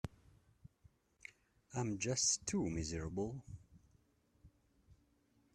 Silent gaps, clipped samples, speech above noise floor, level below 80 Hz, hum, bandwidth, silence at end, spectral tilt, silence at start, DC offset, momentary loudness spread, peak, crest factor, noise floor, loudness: none; under 0.1%; 35 dB; -62 dBFS; none; 13 kHz; 0.6 s; -3.5 dB/octave; 0.05 s; under 0.1%; 23 LU; -22 dBFS; 22 dB; -75 dBFS; -39 LUFS